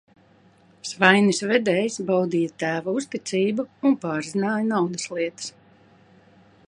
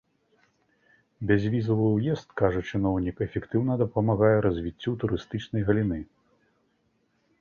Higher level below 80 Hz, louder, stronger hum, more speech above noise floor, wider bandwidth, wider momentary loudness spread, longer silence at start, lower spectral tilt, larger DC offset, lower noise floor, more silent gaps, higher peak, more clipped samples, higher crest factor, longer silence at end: second, -72 dBFS vs -48 dBFS; first, -23 LUFS vs -26 LUFS; neither; second, 34 dB vs 45 dB; first, 11 kHz vs 6.8 kHz; about the same, 10 LU vs 9 LU; second, 0.85 s vs 1.2 s; second, -4.5 dB/octave vs -9 dB/octave; neither; second, -56 dBFS vs -71 dBFS; neither; first, 0 dBFS vs -8 dBFS; neither; about the same, 24 dB vs 20 dB; second, 1.2 s vs 1.35 s